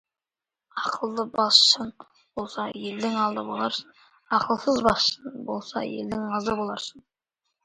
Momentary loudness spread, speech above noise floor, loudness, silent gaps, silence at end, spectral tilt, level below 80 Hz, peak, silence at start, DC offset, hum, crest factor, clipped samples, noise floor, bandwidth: 17 LU; over 64 dB; -24 LUFS; none; 0.65 s; -3 dB/octave; -58 dBFS; -2 dBFS; 0.75 s; under 0.1%; none; 26 dB; under 0.1%; under -90 dBFS; 11 kHz